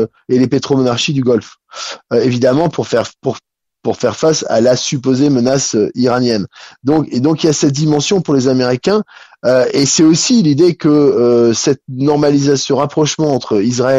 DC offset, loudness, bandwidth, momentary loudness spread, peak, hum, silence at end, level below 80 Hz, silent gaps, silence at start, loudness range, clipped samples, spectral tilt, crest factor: under 0.1%; -13 LUFS; 8.4 kHz; 9 LU; -2 dBFS; none; 0 s; -52 dBFS; none; 0 s; 4 LU; under 0.1%; -5 dB/octave; 12 dB